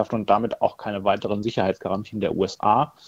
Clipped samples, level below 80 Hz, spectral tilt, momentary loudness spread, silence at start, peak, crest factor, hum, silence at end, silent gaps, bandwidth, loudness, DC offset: under 0.1%; -56 dBFS; -6.5 dB/octave; 6 LU; 0 s; -4 dBFS; 20 dB; none; 0.2 s; none; 15 kHz; -24 LUFS; under 0.1%